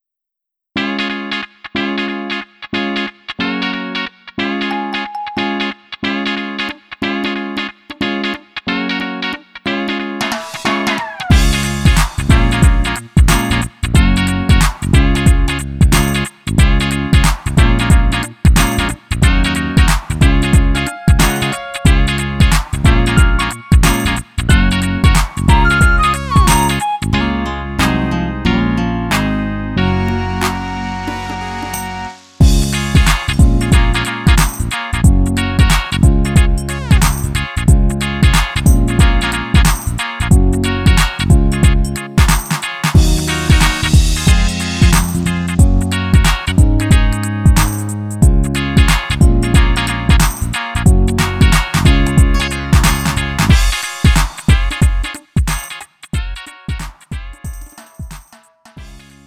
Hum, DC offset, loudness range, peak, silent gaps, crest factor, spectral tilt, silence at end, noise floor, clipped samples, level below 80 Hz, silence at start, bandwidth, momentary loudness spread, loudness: none; under 0.1%; 7 LU; 0 dBFS; none; 12 dB; -5 dB/octave; 0.3 s; -81 dBFS; under 0.1%; -16 dBFS; 0.75 s; 16 kHz; 10 LU; -14 LUFS